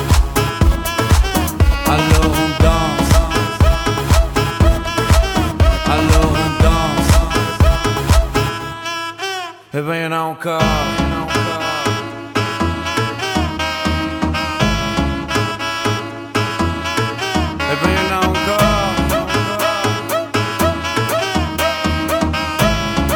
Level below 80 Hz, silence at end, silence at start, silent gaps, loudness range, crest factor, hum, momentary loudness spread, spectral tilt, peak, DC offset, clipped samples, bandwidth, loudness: -20 dBFS; 0 s; 0 s; none; 4 LU; 14 dB; none; 6 LU; -5 dB/octave; -2 dBFS; under 0.1%; under 0.1%; 19 kHz; -16 LUFS